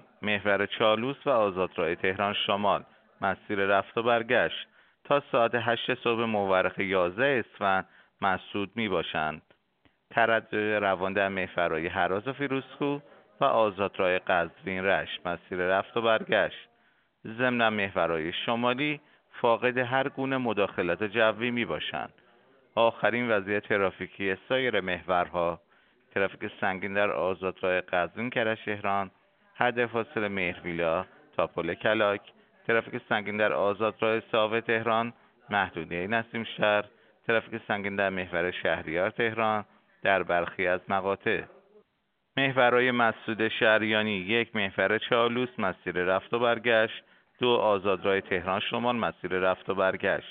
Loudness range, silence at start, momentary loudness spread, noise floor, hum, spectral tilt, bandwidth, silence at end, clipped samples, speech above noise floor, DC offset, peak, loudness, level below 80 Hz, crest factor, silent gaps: 3 LU; 0.2 s; 7 LU; -76 dBFS; none; -2.5 dB/octave; 4.6 kHz; 0 s; under 0.1%; 48 dB; under 0.1%; -6 dBFS; -28 LUFS; -66 dBFS; 24 dB; none